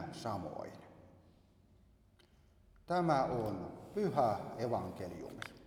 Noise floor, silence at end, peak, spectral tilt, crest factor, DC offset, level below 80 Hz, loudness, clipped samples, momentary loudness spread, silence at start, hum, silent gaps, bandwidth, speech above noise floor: -67 dBFS; 0 s; -18 dBFS; -7 dB/octave; 22 dB; under 0.1%; -66 dBFS; -38 LUFS; under 0.1%; 15 LU; 0 s; none; none; 18 kHz; 29 dB